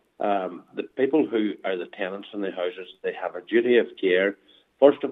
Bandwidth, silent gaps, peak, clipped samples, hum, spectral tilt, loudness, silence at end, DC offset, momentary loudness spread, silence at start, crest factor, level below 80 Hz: 4 kHz; none; -4 dBFS; under 0.1%; none; -7.5 dB/octave; -25 LUFS; 0 s; under 0.1%; 13 LU; 0.2 s; 22 dB; -82 dBFS